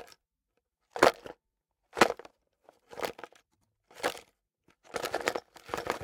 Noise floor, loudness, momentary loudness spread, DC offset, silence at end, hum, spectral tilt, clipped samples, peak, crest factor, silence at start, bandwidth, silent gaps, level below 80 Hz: -83 dBFS; -31 LUFS; 22 LU; under 0.1%; 0 s; none; -3 dB/octave; under 0.1%; -2 dBFS; 32 dB; 0 s; 18 kHz; none; -66 dBFS